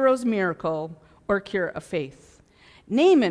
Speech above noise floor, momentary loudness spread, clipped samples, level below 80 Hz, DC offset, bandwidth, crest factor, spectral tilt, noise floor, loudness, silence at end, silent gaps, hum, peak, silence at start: 31 dB; 16 LU; under 0.1%; -58 dBFS; under 0.1%; 11 kHz; 16 dB; -6 dB/octave; -54 dBFS; -24 LUFS; 0 s; none; none; -8 dBFS; 0 s